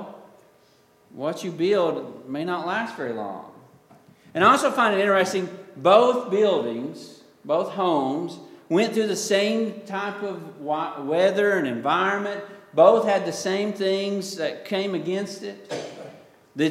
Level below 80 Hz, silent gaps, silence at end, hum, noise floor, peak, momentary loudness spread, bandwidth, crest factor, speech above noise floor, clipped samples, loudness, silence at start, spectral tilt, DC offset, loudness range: -76 dBFS; none; 0 s; none; -58 dBFS; -2 dBFS; 17 LU; 15.5 kHz; 22 dB; 36 dB; under 0.1%; -23 LUFS; 0 s; -4.5 dB/octave; under 0.1%; 7 LU